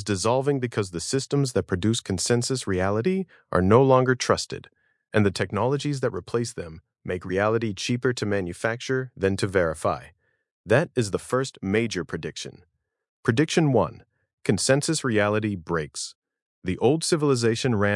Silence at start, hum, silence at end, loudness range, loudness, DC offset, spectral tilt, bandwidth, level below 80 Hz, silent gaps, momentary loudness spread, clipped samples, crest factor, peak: 0 s; none; 0 s; 4 LU; -24 LUFS; under 0.1%; -5 dB/octave; 12 kHz; -60 dBFS; 10.51-10.64 s, 13.09-13.23 s, 14.33-14.38 s, 16.15-16.22 s, 16.42-16.62 s; 11 LU; under 0.1%; 20 dB; -4 dBFS